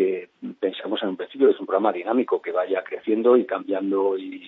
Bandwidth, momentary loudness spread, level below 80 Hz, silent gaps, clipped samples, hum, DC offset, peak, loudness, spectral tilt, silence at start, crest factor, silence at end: 4.1 kHz; 9 LU; -82 dBFS; none; under 0.1%; none; under 0.1%; -6 dBFS; -23 LUFS; -8.5 dB/octave; 0 s; 16 dB; 0 s